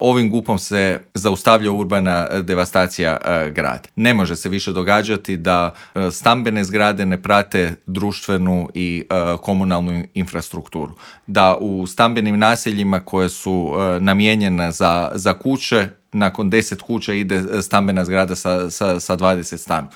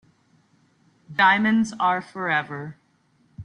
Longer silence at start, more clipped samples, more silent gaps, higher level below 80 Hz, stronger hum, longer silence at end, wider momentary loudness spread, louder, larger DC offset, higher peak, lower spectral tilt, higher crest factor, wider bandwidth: second, 0 s vs 1.1 s; neither; neither; first, -46 dBFS vs -66 dBFS; neither; about the same, 0.05 s vs 0 s; second, 8 LU vs 17 LU; first, -18 LUFS vs -21 LUFS; neither; first, 0 dBFS vs -6 dBFS; about the same, -5 dB/octave vs -5 dB/octave; about the same, 18 dB vs 20 dB; first, 17 kHz vs 10.5 kHz